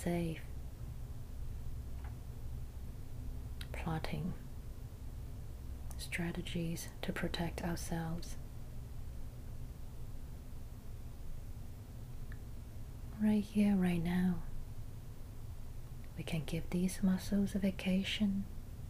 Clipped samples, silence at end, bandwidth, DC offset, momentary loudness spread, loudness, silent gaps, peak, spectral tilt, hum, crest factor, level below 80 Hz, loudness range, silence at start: under 0.1%; 0 s; 15.5 kHz; under 0.1%; 17 LU; -40 LUFS; none; -20 dBFS; -6 dB/octave; none; 18 dB; -46 dBFS; 13 LU; 0 s